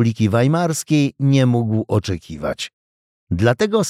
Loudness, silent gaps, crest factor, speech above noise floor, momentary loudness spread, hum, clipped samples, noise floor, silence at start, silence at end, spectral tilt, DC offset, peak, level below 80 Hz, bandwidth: -18 LUFS; 2.73-3.27 s; 14 dB; over 73 dB; 11 LU; none; under 0.1%; under -90 dBFS; 0 s; 0 s; -6 dB/octave; under 0.1%; -4 dBFS; -46 dBFS; 15 kHz